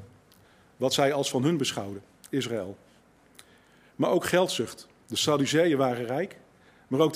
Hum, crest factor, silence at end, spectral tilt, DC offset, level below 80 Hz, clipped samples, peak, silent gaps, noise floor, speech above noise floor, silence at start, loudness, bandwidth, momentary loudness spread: none; 20 dB; 0 s; -4.5 dB/octave; under 0.1%; -70 dBFS; under 0.1%; -8 dBFS; none; -59 dBFS; 33 dB; 0 s; -27 LUFS; 16 kHz; 13 LU